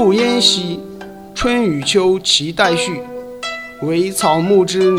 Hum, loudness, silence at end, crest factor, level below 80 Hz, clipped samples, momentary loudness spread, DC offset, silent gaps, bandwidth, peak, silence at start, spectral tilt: none; -15 LUFS; 0 s; 16 dB; -42 dBFS; under 0.1%; 15 LU; 0.2%; none; 16 kHz; 0 dBFS; 0 s; -3.5 dB/octave